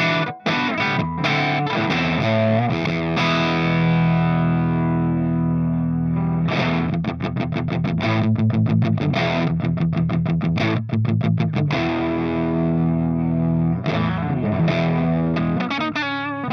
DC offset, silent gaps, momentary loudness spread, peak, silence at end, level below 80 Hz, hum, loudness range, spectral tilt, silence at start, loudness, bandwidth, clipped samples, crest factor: under 0.1%; none; 3 LU; -6 dBFS; 0 s; -48 dBFS; none; 2 LU; -7.5 dB/octave; 0 s; -20 LUFS; 6.4 kHz; under 0.1%; 14 dB